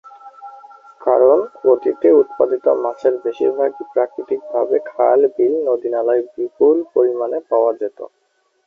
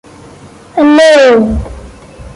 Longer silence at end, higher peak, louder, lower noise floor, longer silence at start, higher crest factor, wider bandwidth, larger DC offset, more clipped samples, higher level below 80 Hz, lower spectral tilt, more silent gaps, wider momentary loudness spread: first, 0.6 s vs 0.05 s; about the same, -2 dBFS vs 0 dBFS; second, -17 LUFS vs -7 LUFS; first, -64 dBFS vs -34 dBFS; second, 0.25 s vs 0.75 s; first, 16 dB vs 10 dB; second, 3.8 kHz vs 11.5 kHz; neither; neither; second, -68 dBFS vs -28 dBFS; first, -8 dB/octave vs -5 dB/octave; neither; second, 10 LU vs 15 LU